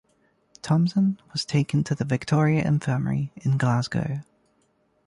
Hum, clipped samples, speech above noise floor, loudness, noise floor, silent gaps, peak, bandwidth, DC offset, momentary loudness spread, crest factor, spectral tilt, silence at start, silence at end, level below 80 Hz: none; under 0.1%; 44 dB; -24 LUFS; -67 dBFS; none; -10 dBFS; 11 kHz; under 0.1%; 7 LU; 16 dB; -7 dB/octave; 0.65 s; 0.85 s; -56 dBFS